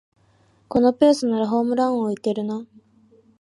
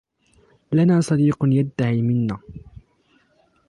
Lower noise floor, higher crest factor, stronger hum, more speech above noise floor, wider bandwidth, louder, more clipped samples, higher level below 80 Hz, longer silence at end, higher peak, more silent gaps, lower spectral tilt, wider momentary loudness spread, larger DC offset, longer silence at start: about the same, -59 dBFS vs -61 dBFS; about the same, 18 dB vs 14 dB; neither; about the same, 39 dB vs 42 dB; about the same, 11.5 kHz vs 11.5 kHz; about the same, -21 LUFS vs -20 LUFS; neither; second, -60 dBFS vs -52 dBFS; second, 0.75 s vs 1.1 s; first, -4 dBFS vs -8 dBFS; neither; second, -6 dB/octave vs -8 dB/octave; about the same, 10 LU vs 10 LU; neither; about the same, 0.7 s vs 0.7 s